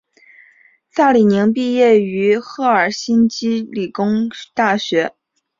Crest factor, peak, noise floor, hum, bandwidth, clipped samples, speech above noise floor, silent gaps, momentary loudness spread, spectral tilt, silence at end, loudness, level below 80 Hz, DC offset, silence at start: 14 dB; -2 dBFS; -52 dBFS; none; 7.6 kHz; under 0.1%; 37 dB; none; 8 LU; -5.5 dB/octave; 0.5 s; -16 LUFS; -60 dBFS; under 0.1%; 0.95 s